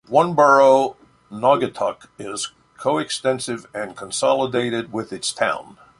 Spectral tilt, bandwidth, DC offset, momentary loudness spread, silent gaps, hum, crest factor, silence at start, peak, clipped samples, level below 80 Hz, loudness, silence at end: -4 dB/octave; 11.5 kHz; under 0.1%; 16 LU; none; none; 20 dB; 0.1 s; 0 dBFS; under 0.1%; -62 dBFS; -20 LUFS; 0.4 s